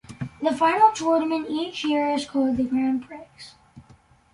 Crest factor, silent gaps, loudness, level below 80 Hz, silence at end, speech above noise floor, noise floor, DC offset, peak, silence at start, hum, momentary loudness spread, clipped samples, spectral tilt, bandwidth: 20 dB; none; -23 LUFS; -58 dBFS; 0.5 s; 32 dB; -55 dBFS; under 0.1%; -4 dBFS; 0.1 s; none; 21 LU; under 0.1%; -5 dB/octave; 11.5 kHz